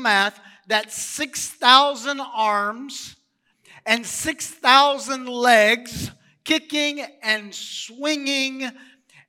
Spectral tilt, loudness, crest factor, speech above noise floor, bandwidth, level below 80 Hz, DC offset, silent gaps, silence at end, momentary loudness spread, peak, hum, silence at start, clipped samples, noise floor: -1.5 dB/octave; -20 LUFS; 22 dB; 43 dB; 17 kHz; -60 dBFS; under 0.1%; none; 0.55 s; 18 LU; 0 dBFS; none; 0 s; under 0.1%; -64 dBFS